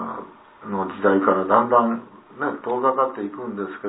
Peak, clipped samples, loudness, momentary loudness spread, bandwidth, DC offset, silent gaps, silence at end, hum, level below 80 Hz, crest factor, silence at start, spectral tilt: -4 dBFS; under 0.1%; -21 LUFS; 13 LU; 4 kHz; under 0.1%; none; 0 s; none; -70 dBFS; 18 dB; 0 s; -10.5 dB/octave